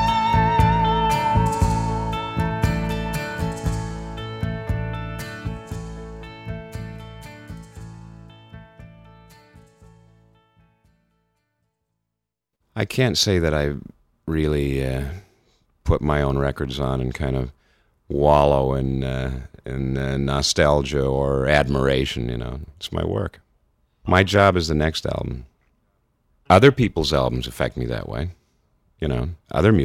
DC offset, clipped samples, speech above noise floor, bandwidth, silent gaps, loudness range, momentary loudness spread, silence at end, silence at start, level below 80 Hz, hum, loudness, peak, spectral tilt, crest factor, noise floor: under 0.1%; under 0.1%; 62 dB; 16 kHz; none; 14 LU; 17 LU; 0 s; 0 s; -34 dBFS; none; -22 LUFS; 0 dBFS; -5.5 dB/octave; 22 dB; -82 dBFS